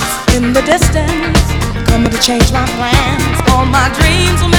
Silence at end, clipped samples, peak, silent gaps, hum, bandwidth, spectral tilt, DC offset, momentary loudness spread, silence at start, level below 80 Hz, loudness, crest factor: 0 s; 0.4%; 0 dBFS; none; none; over 20 kHz; -4.5 dB/octave; under 0.1%; 3 LU; 0 s; -18 dBFS; -11 LUFS; 10 dB